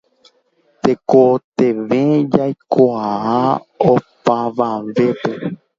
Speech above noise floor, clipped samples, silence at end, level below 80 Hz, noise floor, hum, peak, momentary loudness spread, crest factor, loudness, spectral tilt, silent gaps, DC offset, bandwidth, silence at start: 44 dB; under 0.1%; 0.25 s; -56 dBFS; -59 dBFS; none; 0 dBFS; 7 LU; 16 dB; -16 LUFS; -8 dB/octave; 1.44-1.52 s; under 0.1%; 7.4 kHz; 0.85 s